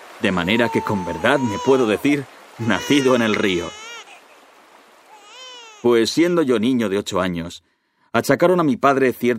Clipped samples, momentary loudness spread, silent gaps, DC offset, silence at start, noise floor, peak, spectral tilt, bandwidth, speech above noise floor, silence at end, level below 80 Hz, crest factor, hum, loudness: under 0.1%; 18 LU; none; under 0.1%; 0 s; -49 dBFS; 0 dBFS; -5 dB/octave; 16 kHz; 31 dB; 0 s; -56 dBFS; 20 dB; none; -19 LUFS